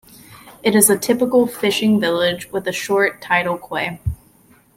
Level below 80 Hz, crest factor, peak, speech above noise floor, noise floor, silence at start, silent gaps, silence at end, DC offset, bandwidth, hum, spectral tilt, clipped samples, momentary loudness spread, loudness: -44 dBFS; 18 dB; 0 dBFS; 35 dB; -52 dBFS; 0.3 s; none; 0.6 s; under 0.1%; 16.5 kHz; none; -3.5 dB/octave; under 0.1%; 11 LU; -17 LUFS